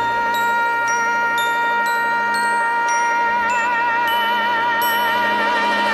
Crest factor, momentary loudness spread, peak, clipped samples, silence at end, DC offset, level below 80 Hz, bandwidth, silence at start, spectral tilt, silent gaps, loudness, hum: 10 dB; 1 LU; -8 dBFS; under 0.1%; 0 s; under 0.1%; -56 dBFS; 15 kHz; 0 s; -1.5 dB/octave; none; -17 LUFS; none